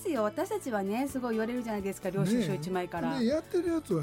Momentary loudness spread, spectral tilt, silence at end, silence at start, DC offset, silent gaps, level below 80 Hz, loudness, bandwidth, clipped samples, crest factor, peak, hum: 5 LU; -6 dB/octave; 0 s; 0 s; under 0.1%; none; -60 dBFS; -32 LUFS; 16.5 kHz; under 0.1%; 14 dB; -18 dBFS; none